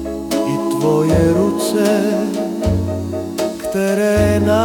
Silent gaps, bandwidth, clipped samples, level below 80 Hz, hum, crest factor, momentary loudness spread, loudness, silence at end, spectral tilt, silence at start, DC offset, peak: none; 18 kHz; under 0.1%; -34 dBFS; none; 14 dB; 8 LU; -17 LUFS; 0 s; -6 dB/octave; 0 s; under 0.1%; -2 dBFS